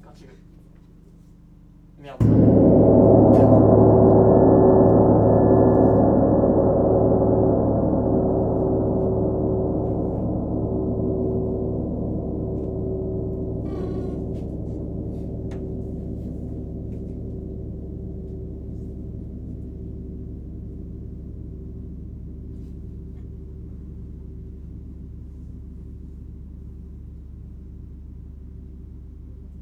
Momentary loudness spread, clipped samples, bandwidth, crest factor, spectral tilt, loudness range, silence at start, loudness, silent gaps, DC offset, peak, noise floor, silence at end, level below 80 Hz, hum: 26 LU; under 0.1%; 2.8 kHz; 20 dB; -12.5 dB/octave; 24 LU; 0.2 s; -19 LUFS; none; under 0.1%; 0 dBFS; -48 dBFS; 0 s; -34 dBFS; none